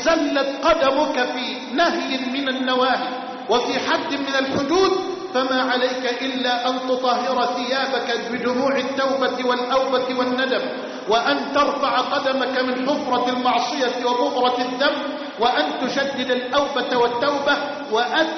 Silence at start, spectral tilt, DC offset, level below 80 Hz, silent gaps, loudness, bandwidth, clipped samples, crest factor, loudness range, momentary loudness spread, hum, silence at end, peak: 0 s; -0.5 dB/octave; under 0.1%; -58 dBFS; none; -21 LUFS; 6.4 kHz; under 0.1%; 14 dB; 1 LU; 4 LU; none; 0 s; -8 dBFS